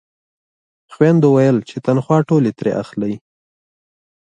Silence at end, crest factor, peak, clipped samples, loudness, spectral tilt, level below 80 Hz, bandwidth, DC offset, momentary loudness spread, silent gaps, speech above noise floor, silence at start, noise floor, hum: 1.05 s; 16 dB; 0 dBFS; under 0.1%; -16 LUFS; -8.5 dB/octave; -60 dBFS; 9.2 kHz; under 0.1%; 11 LU; none; over 75 dB; 0.9 s; under -90 dBFS; none